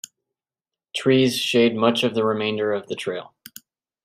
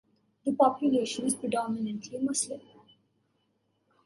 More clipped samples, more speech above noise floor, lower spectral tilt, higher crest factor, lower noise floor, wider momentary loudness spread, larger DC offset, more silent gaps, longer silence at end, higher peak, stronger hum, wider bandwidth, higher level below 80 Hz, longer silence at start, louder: neither; first, 69 dB vs 46 dB; about the same, -5 dB/octave vs -4 dB/octave; about the same, 18 dB vs 20 dB; first, -90 dBFS vs -74 dBFS; first, 14 LU vs 10 LU; neither; neither; second, 0.8 s vs 1.45 s; first, -4 dBFS vs -12 dBFS; neither; first, 16 kHz vs 12 kHz; first, -68 dBFS vs -76 dBFS; first, 0.95 s vs 0.45 s; first, -21 LUFS vs -29 LUFS